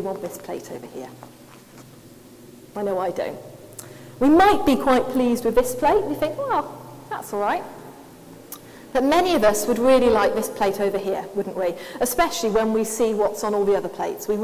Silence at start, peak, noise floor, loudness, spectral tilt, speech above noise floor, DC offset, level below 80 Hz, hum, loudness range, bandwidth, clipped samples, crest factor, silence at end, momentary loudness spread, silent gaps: 0 s; -4 dBFS; -46 dBFS; -21 LUFS; -4.5 dB/octave; 25 dB; under 0.1%; -48 dBFS; none; 12 LU; 16 kHz; under 0.1%; 18 dB; 0 s; 22 LU; none